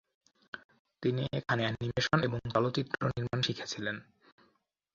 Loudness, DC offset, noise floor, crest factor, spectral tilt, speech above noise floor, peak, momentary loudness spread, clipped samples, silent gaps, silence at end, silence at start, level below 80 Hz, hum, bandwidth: -33 LUFS; under 0.1%; -74 dBFS; 24 dB; -5.5 dB/octave; 41 dB; -10 dBFS; 16 LU; under 0.1%; 0.64-0.69 s, 0.79-0.85 s; 0.9 s; 0.55 s; -60 dBFS; none; 7.6 kHz